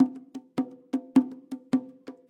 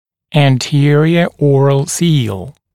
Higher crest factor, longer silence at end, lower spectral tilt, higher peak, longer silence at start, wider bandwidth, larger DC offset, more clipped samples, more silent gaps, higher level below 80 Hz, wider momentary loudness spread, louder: first, 20 dB vs 12 dB; about the same, 0.15 s vs 0.25 s; about the same, -7 dB/octave vs -6 dB/octave; second, -8 dBFS vs 0 dBFS; second, 0 s vs 0.3 s; second, 9.4 kHz vs 13.5 kHz; second, under 0.1% vs 0.9%; neither; neither; second, -78 dBFS vs -50 dBFS; first, 17 LU vs 6 LU; second, -29 LUFS vs -12 LUFS